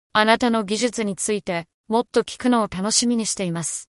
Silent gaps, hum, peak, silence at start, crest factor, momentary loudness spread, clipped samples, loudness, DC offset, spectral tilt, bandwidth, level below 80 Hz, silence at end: 1.74-1.84 s; none; -4 dBFS; 0.15 s; 18 dB; 7 LU; under 0.1%; -21 LUFS; under 0.1%; -3 dB/octave; 11.5 kHz; -56 dBFS; 0.05 s